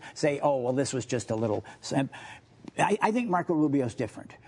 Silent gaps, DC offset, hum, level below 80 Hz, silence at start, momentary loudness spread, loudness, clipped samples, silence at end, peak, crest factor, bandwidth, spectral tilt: none; under 0.1%; none; -68 dBFS; 0 s; 10 LU; -28 LUFS; under 0.1%; 0.1 s; -8 dBFS; 20 dB; 11 kHz; -5.5 dB/octave